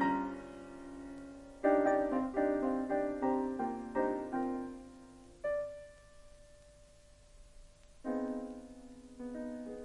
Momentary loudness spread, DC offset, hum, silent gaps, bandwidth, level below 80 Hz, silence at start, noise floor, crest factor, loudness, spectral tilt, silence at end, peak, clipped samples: 20 LU; under 0.1%; 50 Hz at -65 dBFS; none; 11.5 kHz; -62 dBFS; 0 s; -60 dBFS; 20 dB; -36 LUFS; -6.5 dB/octave; 0 s; -16 dBFS; under 0.1%